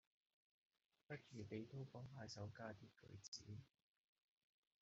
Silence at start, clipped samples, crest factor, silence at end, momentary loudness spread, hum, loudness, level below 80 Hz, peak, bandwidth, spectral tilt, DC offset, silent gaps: 1.1 s; under 0.1%; 20 dB; 1.15 s; 8 LU; none; -57 LUFS; -86 dBFS; -38 dBFS; 7.6 kHz; -5 dB/octave; under 0.1%; 3.28-3.32 s